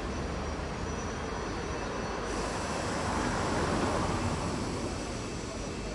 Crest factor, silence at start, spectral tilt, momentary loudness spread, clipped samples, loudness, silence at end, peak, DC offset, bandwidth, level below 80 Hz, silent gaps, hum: 16 dB; 0 s; -5 dB/octave; 6 LU; under 0.1%; -33 LUFS; 0 s; -16 dBFS; under 0.1%; 11.5 kHz; -42 dBFS; none; none